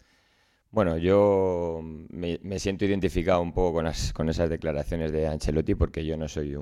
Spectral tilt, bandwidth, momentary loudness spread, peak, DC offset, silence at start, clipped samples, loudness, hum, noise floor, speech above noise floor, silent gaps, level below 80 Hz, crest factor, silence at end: -6.5 dB/octave; 13.5 kHz; 10 LU; -10 dBFS; under 0.1%; 0.75 s; under 0.1%; -27 LUFS; none; -66 dBFS; 40 dB; none; -38 dBFS; 16 dB; 0 s